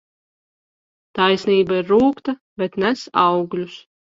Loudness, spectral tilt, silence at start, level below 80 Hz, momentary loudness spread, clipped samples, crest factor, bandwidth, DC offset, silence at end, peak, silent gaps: -19 LUFS; -6 dB/octave; 1.15 s; -58 dBFS; 12 LU; under 0.1%; 20 dB; 7.6 kHz; under 0.1%; 0.35 s; 0 dBFS; 2.41-2.56 s